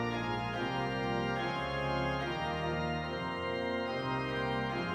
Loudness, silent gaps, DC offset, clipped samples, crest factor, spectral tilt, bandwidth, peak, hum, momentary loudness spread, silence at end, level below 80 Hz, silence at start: -35 LUFS; none; under 0.1%; under 0.1%; 14 dB; -6.5 dB/octave; 16 kHz; -20 dBFS; none; 2 LU; 0 s; -52 dBFS; 0 s